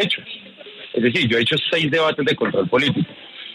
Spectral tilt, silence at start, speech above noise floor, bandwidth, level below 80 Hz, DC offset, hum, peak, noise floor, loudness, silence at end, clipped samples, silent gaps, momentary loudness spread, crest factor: -5.5 dB/octave; 0 s; 20 dB; 12 kHz; -58 dBFS; under 0.1%; none; -4 dBFS; -39 dBFS; -19 LUFS; 0 s; under 0.1%; none; 18 LU; 16 dB